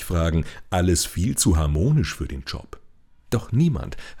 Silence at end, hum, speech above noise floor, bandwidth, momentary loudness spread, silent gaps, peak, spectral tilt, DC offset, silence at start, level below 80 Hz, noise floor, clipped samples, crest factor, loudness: 0 s; none; 27 dB; 20 kHz; 12 LU; none; -8 dBFS; -5 dB/octave; under 0.1%; 0 s; -34 dBFS; -49 dBFS; under 0.1%; 16 dB; -23 LUFS